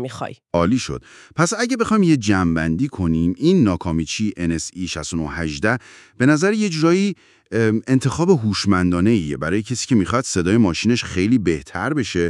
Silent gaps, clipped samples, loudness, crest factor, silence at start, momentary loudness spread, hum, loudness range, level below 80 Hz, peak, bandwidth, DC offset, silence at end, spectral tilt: none; under 0.1%; -19 LUFS; 16 dB; 0 s; 9 LU; none; 2 LU; -46 dBFS; -2 dBFS; 12 kHz; under 0.1%; 0 s; -5.5 dB/octave